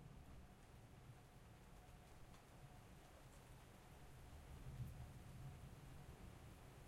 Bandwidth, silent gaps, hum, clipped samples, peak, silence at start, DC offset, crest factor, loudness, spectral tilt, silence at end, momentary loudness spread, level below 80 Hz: 16 kHz; none; none; under 0.1%; -42 dBFS; 0 s; under 0.1%; 18 dB; -62 LUFS; -5.5 dB/octave; 0 s; 8 LU; -66 dBFS